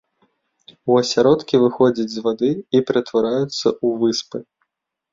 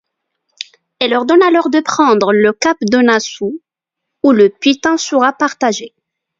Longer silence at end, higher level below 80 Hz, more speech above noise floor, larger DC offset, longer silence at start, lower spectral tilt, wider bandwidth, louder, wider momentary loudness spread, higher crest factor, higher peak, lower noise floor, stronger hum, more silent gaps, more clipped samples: first, 0.7 s vs 0.5 s; about the same, -60 dBFS vs -58 dBFS; second, 58 dB vs 67 dB; neither; second, 0.85 s vs 1 s; first, -5.5 dB/octave vs -4 dB/octave; about the same, 7.6 kHz vs 7.8 kHz; second, -18 LUFS vs -12 LUFS; second, 8 LU vs 13 LU; about the same, 16 dB vs 14 dB; about the same, -2 dBFS vs 0 dBFS; about the same, -76 dBFS vs -79 dBFS; neither; neither; neither